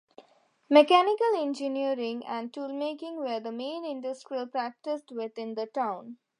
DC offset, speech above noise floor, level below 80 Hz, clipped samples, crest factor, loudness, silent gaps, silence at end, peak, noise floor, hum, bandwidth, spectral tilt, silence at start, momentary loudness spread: under 0.1%; 35 dB; -88 dBFS; under 0.1%; 24 dB; -29 LUFS; none; 0.25 s; -6 dBFS; -63 dBFS; none; 10.5 kHz; -4 dB/octave; 0.2 s; 14 LU